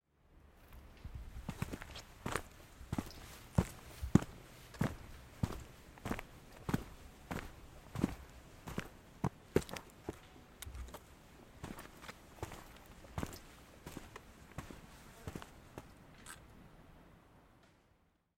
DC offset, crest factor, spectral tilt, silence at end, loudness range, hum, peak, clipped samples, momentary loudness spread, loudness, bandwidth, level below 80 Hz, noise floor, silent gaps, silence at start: under 0.1%; 34 dB; -6 dB/octave; 0.65 s; 13 LU; none; -10 dBFS; under 0.1%; 21 LU; -44 LUFS; 16.5 kHz; -56 dBFS; -74 dBFS; none; 0.3 s